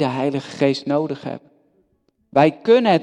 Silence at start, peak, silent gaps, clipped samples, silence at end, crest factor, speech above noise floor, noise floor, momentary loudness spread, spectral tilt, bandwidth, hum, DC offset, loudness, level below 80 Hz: 0 s; 0 dBFS; none; under 0.1%; 0 s; 18 dB; 47 dB; -65 dBFS; 15 LU; -6.5 dB/octave; 10 kHz; none; under 0.1%; -19 LUFS; -64 dBFS